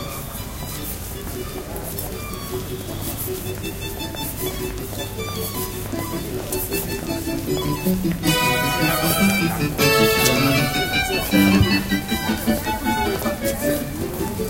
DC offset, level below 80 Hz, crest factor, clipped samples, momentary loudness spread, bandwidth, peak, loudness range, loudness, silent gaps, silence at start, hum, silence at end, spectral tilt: under 0.1%; -36 dBFS; 20 dB; under 0.1%; 13 LU; 17 kHz; -2 dBFS; 11 LU; -21 LUFS; none; 0 s; none; 0 s; -4 dB/octave